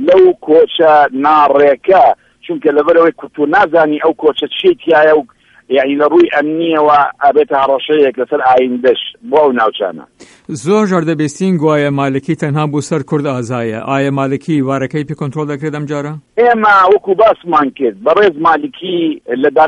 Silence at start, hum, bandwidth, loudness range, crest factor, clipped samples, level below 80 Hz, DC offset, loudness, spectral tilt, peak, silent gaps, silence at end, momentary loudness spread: 0 s; none; 11 kHz; 5 LU; 12 dB; under 0.1%; -52 dBFS; under 0.1%; -12 LUFS; -6.5 dB/octave; 0 dBFS; none; 0 s; 10 LU